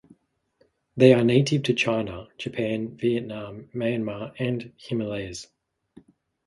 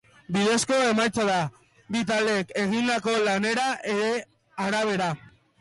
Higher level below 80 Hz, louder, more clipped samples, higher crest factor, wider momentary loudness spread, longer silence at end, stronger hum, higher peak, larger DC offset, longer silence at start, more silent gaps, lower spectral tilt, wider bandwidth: first, -58 dBFS vs -64 dBFS; about the same, -24 LUFS vs -25 LUFS; neither; first, 24 dB vs 10 dB; first, 17 LU vs 9 LU; first, 1.05 s vs 0.45 s; neither; first, -2 dBFS vs -14 dBFS; neither; first, 0.95 s vs 0.3 s; neither; first, -6.5 dB/octave vs -4 dB/octave; about the same, 11.5 kHz vs 11.5 kHz